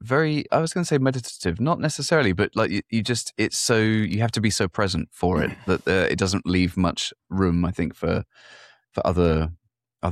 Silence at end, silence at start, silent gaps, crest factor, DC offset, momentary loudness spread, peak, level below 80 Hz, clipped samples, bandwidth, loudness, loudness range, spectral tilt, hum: 0 s; 0 s; none; 16 dB; under 0.1%; 6 LU; -6 dBFS; -42 dBFS; under 0.1%; 14 kHz; -23 LUFS; 2 LU; -5 dB/octave; none